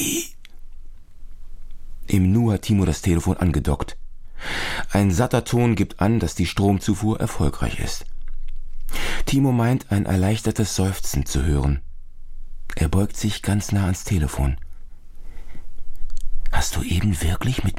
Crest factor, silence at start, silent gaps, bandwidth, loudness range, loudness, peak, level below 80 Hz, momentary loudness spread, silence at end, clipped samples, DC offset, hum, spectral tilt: 18 dB; 0 s; none; 16 kHz; 5 LU; -22 LUFS; -2 dBFS; -28 dBFS; 15 LU; 0 s; under 0.1%; under 0.1%; none; -5.5 dB/octave